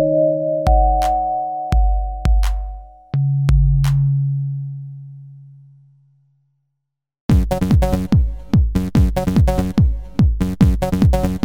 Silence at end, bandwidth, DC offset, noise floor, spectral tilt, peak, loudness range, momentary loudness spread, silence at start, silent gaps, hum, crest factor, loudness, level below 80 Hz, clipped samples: 0 s; 16 kHz; under 0.1%; -77 dBFS; -8.5 dB/octave; -2 dBFS; 7 LU; 11 LU; 0 s; 7.20-7.29 s; none; 16 dB; -18 LUFS; -20 dBFS; under 0.1%